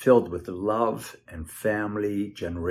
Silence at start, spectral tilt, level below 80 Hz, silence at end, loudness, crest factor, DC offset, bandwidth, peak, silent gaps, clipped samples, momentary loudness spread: 0 s; -6.5 dB/octave; -54 dBFS; 0 s; -27 LUFS; 20 dB; under 0.1%; 14.5 kHz; -6 dBFS; none; under 0.1%; 16 LU